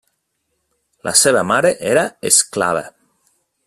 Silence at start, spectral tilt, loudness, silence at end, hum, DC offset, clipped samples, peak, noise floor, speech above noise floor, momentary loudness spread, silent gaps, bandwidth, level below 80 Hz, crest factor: 1.05 s; -2 dB/octave; -14 LUFS; 0.75 s; none; under 0.1%; under 0.1%; 0 dBFS; -71 dBFS; 55 dB; 8 LU; none; 16 kHz; -58 dBFS; 18 dB